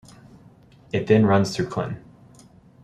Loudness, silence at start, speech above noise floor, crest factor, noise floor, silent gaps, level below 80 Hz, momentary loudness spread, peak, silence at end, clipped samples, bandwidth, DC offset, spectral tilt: -22 LUFS; 0.95 s; 31 dB; 20 dB; -51 dBFS; none; -56 dBFS; 14 LU; -4 dBFS; 0.85 s; under 0.1%; 12.5 kHz; under 0.1%; -7 dB/octave